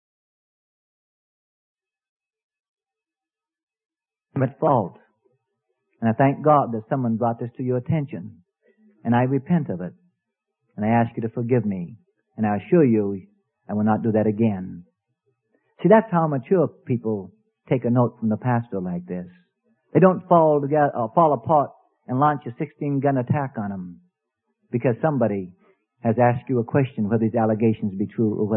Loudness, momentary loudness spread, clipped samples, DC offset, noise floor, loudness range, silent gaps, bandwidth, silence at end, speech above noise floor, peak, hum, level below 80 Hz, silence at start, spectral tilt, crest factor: -22 LUFS; 14 LU; under 0.1%; under 0.1%; under -90 dBFS; 6 LU; none; 3.5 kHz; 0 s; over 69 dB; -2 dBFS; none; -64 dBFS; 4.35 s; -13 dB/octave; 22 dB